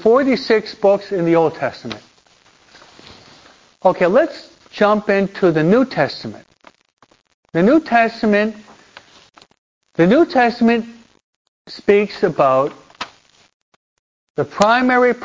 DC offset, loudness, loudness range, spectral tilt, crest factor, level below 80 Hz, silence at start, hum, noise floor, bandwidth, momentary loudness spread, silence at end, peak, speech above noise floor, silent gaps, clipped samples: under 0.1%; -16 LUFS; 4 LU; -6.5 dB/octave; 18 dB; -56 dBFS; 0 s; none; -53 dBFS; 7.6 kHz; 18 LU; 0 s; 0 dBFS; 38 dB; 6.93-6.97 s, 7.34-7.43 s, 9.58-9.81 s, 11.23-11.65 s, 13.53-14.35 s; under 0.1%